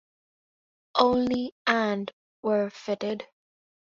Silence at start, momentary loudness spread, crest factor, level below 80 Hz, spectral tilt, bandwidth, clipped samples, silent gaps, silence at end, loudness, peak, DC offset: 0.95 s; 11 LU; 24 dB; -64 dBFS; -5.5 dB/octave; 7.4 kHz; under 0.1%; 1.52-1.65 s, 2.13-2.43 s; 0.65 s; -27 LUFS; -4 dBFS; under 0.1%